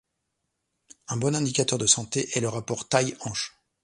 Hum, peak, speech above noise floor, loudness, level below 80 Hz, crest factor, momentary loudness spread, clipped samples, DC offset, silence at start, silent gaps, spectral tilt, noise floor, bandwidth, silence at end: none; -6 dBFS; 53 dB; -25 LUFS; -62 dBFS; 22 dB; 11 LU; under 0.1%; under 0.1%; 1.1 s; none; -3.5 dB/octave; -80 dBFS; 11.5 kHz; 0.35 s